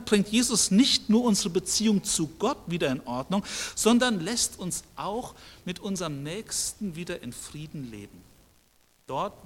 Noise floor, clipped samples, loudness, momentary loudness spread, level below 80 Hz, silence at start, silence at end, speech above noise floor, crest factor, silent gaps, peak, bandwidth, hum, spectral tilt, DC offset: -63 dBFS; under 0.1%; -26 LUFS; 17 LU; -54 dBFS; 0 s; 0 s; 36 dB; 22 dB; none; -6 dBFS; 16.5 kHz; none; -3.5 dB/octave; under 0.1%